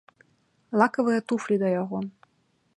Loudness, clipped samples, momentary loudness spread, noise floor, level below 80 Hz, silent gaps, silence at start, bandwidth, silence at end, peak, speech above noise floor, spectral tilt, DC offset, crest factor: -25 LUFS; under 0.1%; 11 LU; -69 dBFS; -74 dBFS; none; 0.7 s; 10.5 kHz; 0.65 s; -6 dBFS; 44 dB; -7 dB/octave; under 0.1%; 22 dB